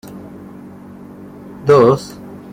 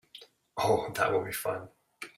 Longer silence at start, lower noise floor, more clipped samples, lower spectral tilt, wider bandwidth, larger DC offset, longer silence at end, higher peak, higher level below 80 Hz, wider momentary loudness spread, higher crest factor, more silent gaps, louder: about the same, 0.1 s vs 0.15 s; second, -36 dBFS vs -55 dBFS; neither; first, -7 dB/octave vs -4 dB/octave; about the same, 15.5 kHz vs 16 kHz; neither; about the same, 0.15 s vs 0.1 s; first, -2 dBFS vs -12 dBFS; first, -52 dBFS vs -64 dBFS; first, 26 LU vs 20 LU; about the same, 16 dB vs 20 dB; neither; first, -13 LUFS vs -30 LUFS